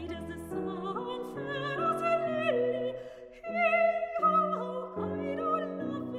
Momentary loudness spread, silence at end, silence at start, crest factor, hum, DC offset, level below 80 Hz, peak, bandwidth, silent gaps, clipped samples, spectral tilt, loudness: 12 LU; 0 s; 0 s; 16 dB; none; under 0.1%; -62 dBFS; -16 dBFS; 13.5 kHz; none; under 0.1%; -6.5 dB/octave; -31 LUFS